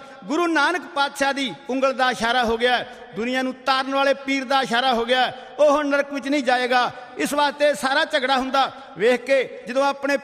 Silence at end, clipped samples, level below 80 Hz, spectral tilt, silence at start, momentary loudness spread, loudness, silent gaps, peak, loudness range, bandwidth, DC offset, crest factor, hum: 0 s; under 0.1%; -56 dBFS; -3 dB/octave; 0 s; 6 LU; -21 LUFS; none; -6 dBFS; 1 LU; 15.5 kHz; under 0.1%; 14 dB; none